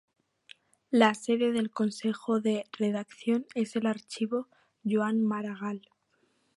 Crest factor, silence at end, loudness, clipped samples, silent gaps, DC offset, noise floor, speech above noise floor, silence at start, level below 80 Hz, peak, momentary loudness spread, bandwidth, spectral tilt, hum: 24 dB; 0.8 s; -30 LUFS; under 0.1%; none; under 0.1%; -72 dBFS; 43 dB; 0.9 s; -78 dBFS; -8 dBFS; 11 LU; 11.5 kHz; -5.5 dB/octave; none